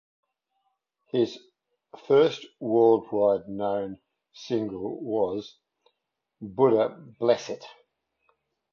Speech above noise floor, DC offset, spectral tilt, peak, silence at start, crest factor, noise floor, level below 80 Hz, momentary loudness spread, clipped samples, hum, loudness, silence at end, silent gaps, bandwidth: 57 dB; under 0.1%; -6.5 dB/octave; -8 dBFS; 1.15 s; 20 dB; -82 dBFS; -68 dBFS; 17 LU; under 0.1%; none; -26 LUFS; 1.05 s; none; 7 kHz